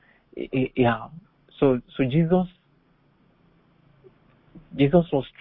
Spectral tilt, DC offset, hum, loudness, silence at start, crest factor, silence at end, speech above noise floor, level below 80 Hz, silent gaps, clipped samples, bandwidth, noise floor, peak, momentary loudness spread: -12 dB/octave; under 0.1%; none; -23 LUFS; 0.35 s; 22 dB; 0.15 s; 40 dB; -50 dBFS; none; under 0.1%; 4.1 kHz; -62 dBFS; -4 dBFS; 17 LU